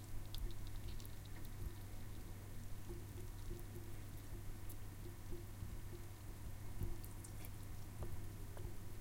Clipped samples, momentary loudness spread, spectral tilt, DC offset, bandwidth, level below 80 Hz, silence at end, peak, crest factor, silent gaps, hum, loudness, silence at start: under 0.1%; 3 LU; -5.5 dB/octave; under 0.1%; 16.5 kHz; -52 dBFS; 0 s; -32 dBFS; 16 dB; none; none; -53 LUFS; 0 s